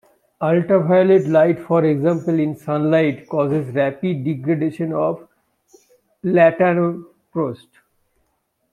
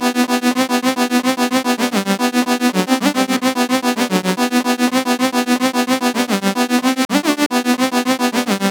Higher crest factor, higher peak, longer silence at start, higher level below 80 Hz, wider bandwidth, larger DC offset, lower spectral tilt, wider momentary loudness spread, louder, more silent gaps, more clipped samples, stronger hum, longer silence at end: about the same, 16 dB vs 14 dB; about the same, -2 dBFS vs -2 dBFS; first, 0.4 s vs 0 s; first, -64 dBFS vs -72 dBFS; second, 10 kHz vs over 20 kHz; neither; first, -9 dB/octave vs -3.5 dB/octave; first, 11 LU vs 1 LU; about the same, -18 LUFS vs -16 LUFS; second, none vs 7.05-7.09 s, 7.46-7.50 s; neither; neither; first, 1.15 s vs 0 s